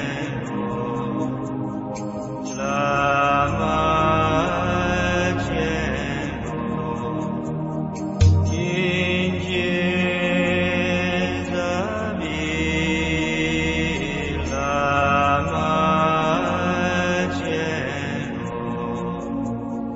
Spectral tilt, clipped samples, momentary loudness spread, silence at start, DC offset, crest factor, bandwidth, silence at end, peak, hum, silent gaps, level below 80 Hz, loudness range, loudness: -6 dB/octave; under 0.1%; 9 LU; 0 s; under 0.1%; 18 dB; 8 kHz; 0 s; -4 dBFS; none; none; -38 dBFS; 4 LU; -22 LUFS